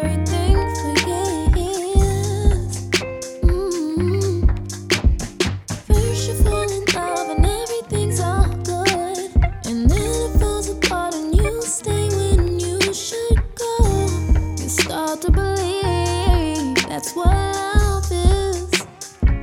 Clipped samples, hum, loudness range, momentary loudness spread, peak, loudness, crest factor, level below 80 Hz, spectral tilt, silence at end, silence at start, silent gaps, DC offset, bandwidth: under 0.1%; none; 1 LU; 4 LU; -2 dBFS; -20 LUFS; 16 dB; -22 dBFS; -5 dB/octave; 0 s; 0 s; none; under 0.1%; 16.5 kHz